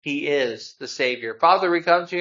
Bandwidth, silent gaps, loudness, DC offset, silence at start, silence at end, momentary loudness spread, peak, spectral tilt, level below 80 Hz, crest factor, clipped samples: 7.6 kHz; none; -21 LUFS; under 0.1%; 0.05 s; 0 s; 11 LU; -2 dBFS; -4 dB/octave; -76 dBFS; 20 dB; under 0.1%